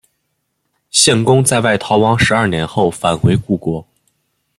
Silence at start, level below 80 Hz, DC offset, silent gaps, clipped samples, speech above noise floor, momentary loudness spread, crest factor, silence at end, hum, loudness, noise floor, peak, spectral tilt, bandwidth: 0.95 s; -42 dBFS; under 0.1%; none; under 0.1%; 55 dB; 8 LU; 16 dB; 0.75 s; none; -13 LUFS; -69 dBFS; 0 dBFS; -4 dB/octave; 14 kHz